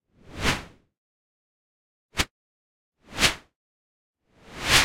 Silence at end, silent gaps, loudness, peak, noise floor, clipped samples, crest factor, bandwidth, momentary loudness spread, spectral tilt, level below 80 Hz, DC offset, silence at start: 0 s; 0.98-2.09 s, 2.31-2.92 s, 3.56-4.14 s; -26 LUFS; -4 dBFS; -44 dBFS; under 0.1%; 26 dB; 16.5 kHz; 18 LU; -1.5 dB/octave; -44 dBFS; under 0.1%; 0.3 s